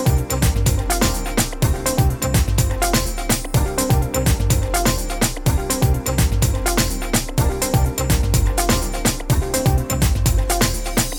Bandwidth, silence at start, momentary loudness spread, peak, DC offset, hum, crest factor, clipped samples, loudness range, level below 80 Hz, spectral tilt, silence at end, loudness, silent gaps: 19.5 kHz; 0 s; 3 LU; -2 dBFS; under 0.1%; none; 14 dB; under 0.1%; 0 LU; -22 dBFS; -4.5 dB/octave; 0 s; -19 LUFS; none